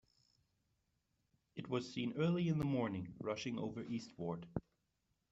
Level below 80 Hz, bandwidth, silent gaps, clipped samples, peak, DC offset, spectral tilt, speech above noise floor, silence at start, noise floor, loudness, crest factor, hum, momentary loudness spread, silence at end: -70 dBFS; 8 kHz; none; under 0.1%; -24 dBFS; under 0.1%; -6.5 dB/octave; 44 dB; 1.55 s; -84 dBFS; -41 LUFS; 18 dB; none; 11 LU; 0.7 s